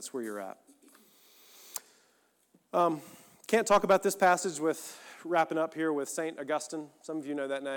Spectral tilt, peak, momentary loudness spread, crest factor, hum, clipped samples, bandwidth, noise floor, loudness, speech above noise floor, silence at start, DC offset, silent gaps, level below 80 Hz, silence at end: -4 dB/octave; -14 dBFS; 17 LU; 18 dB; none; under 0.1%; 19 kHz; -70 dBFS; -30 LUFS; 39 dB; 0 s; under 0.1%; none; -74 dBFS; 0 s